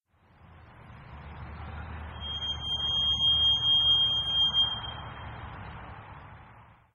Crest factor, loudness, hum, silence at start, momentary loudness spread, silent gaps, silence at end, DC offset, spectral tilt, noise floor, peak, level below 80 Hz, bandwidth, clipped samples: 14 dB; -24 LUFS; none; 0.5 s; 24 LU; none; 0.3 s; under 0.1%; -3 dB/octave; -58 dBFS; -16 dBFS; -48 dBFS; 10 kHz; under 0.1%